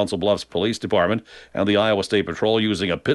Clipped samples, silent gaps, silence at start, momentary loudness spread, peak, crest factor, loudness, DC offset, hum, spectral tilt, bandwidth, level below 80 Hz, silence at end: under 0.1%; none; 0 s; 5 LU; -6 dBFS; 14 dB; -21 LUFS; under 0.1%; none; -5.5 dB/octave; 11.5 kHz; -52 dBFS; 0 s